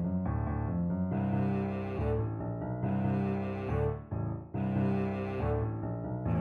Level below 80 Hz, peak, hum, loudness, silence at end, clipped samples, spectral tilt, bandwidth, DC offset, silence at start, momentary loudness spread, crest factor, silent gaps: -44 dBFS; -20 dBFS; none; -33 LUFS; 0 s; under 0.1%; -11 dB/octave; 4.6 kHz; under 0.1%; 0 s; 6 LU; 12 dB; none